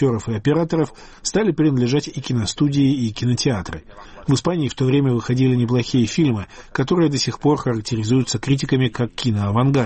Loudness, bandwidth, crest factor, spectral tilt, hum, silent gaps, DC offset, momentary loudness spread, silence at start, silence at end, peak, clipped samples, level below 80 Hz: -20 LUFS; 8.8 kHz; 12 dB; -6 dB/octave; none; none; 0.1%; 6 LU; 0 s; 0 s; -6 dBFS; under 0.1%; -44 dBFS